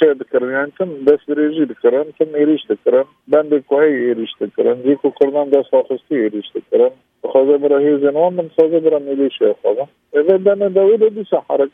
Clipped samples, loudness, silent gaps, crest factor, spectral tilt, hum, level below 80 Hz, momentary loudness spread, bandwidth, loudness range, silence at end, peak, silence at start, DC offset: under 0.1%; -15 LUFS; none; 14 dB; -8.5 dB/octave; none; -68 dBFS; 6 LU; 3.8 kHz; 1 LU; 0.05 s; 0 dBFS; 0 s; under 0.1%